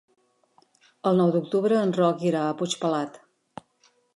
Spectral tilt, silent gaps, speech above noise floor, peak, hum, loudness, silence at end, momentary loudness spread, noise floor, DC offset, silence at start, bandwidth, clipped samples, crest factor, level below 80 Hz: -6 dB/octave; none; 42 dB; -10 dBFS; none; -24 LUFS; 1 s; 8 LU; -65 dBFS; under 0.1%; 1.05 s; 11.5 kHz; under 0.1%; 16 dB; -74 dBFS